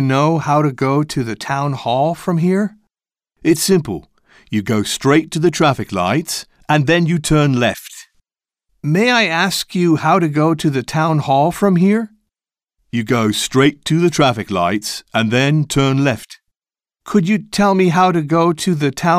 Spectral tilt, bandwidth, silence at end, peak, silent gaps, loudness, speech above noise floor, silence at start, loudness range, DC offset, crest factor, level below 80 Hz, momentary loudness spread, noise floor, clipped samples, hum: -5.5 dB/octave; 15.5 kHz; 0 s; -2 dBFS; none; -16 LUFS; over 75 dB; 0 s; 3 LU; under 0.1%; 14 dB; -46 dBFS; 8 LU; under -90 dBFS; under 0.1%; none